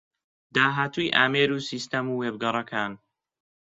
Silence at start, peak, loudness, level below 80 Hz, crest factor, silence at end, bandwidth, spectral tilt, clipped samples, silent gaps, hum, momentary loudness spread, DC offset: 0.55 s; -4 dBFS; -25 LUFS; -68 dBFS; 24 dB; 0.65 s; 8 kHz; -4.5 dB/octave; under 0.1%; none; none; 9 LU; under 0.1%